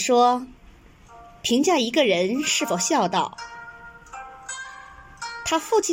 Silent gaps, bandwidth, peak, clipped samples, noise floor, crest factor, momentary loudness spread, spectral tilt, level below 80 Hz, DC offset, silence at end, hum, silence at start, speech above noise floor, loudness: none; 16.5 kHz; -6 dBFS; under 0.1%; -49 dBFS; 18 dB; 20 LU; -2.5 dB/octave; -56 dBFS; under 0.1%; 0 s; none; 0 s; 28 dB; -22 LUFS